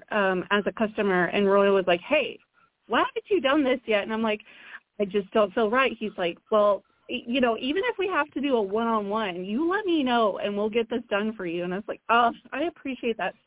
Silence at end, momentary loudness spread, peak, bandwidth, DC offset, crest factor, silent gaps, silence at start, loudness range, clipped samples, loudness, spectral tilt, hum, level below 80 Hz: 0.15 s; 9 LU; -8 dBFS; 4 kHz; under 0.1%; 16 dB; none; 0.1 s; 2 LU; under 0.1%; -25 LUFS; -9 dB/octave; none; -62 dBFS